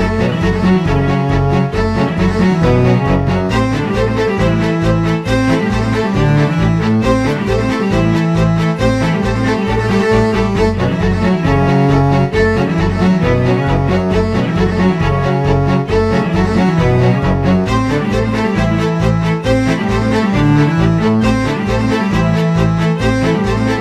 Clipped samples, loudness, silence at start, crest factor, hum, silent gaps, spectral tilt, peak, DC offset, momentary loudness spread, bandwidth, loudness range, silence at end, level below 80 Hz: under 0.1%; -13 LUFS; 0 s; 12 dB; none; none; -7.5 dB/octave; 0 dBFS; under 0.1%; 3 LU; 11.5 kHz; 1 LU; 0 s; -26 dBFS